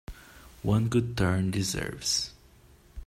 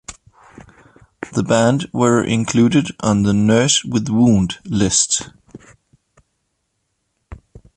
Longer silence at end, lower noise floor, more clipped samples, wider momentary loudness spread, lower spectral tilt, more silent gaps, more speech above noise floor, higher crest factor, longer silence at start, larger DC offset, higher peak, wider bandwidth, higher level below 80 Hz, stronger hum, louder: second, 0 s vs 0.2 s; second, -57 dBFS vs -71 dBFS; neither; first, 12 LU vs 8 LU; about the same, -4.5 dB/octave vs -4.5 dB/octave; neither; second, 29 dB vs 55 dB; about the same, 18 dB vs 16 dB; about the same, 0.1 s vs 0.1 s; neither; second, -12 dBFS vs -2 dBFS; first, 15.5 kHz vs 11 kHz; about the same, -48 dBFS vs -44 dBFS; neither; second, -28 LUFS vs -16 LUFS